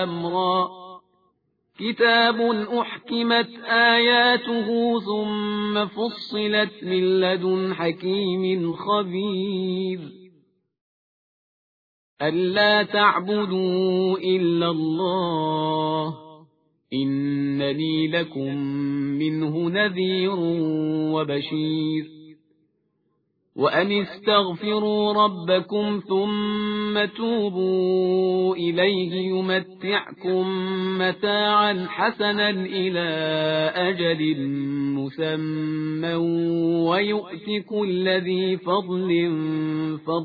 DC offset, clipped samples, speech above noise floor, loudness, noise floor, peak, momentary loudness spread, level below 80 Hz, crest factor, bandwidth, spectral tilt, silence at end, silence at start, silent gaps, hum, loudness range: under 0.1%; under 0.1%; 48 dB; -23 LUFS; -71 dBFS; -6 dBFS; 7 LU; -66 dBFS; 18 dB; 5 kHz; -8 dB/octave; 0 s; 0 s; 10.81-12.17 s; none; 5 LU